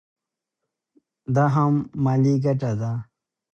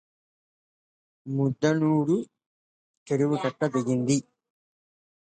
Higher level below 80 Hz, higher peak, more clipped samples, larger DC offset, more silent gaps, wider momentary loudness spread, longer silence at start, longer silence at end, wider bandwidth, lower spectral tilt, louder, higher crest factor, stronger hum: first, -60 dBFS vs -72 dBFS; about the same, -8 dBFS vs -10 dBFS; neither; neither; second, none vs 2.46-3.06 s; about the same, 10 LU vs 8 LU; about the same, 1.3 s vs 1.25 s; second, 0.55 s vs 1.1 s; second, 7 kHz vs 9.2 kHz; first, -9 dB/octave vs -6.5 dB/octave; first, -22 LUFS vs -26 LUFS; about the same, 16 dB vs 18 dB; neither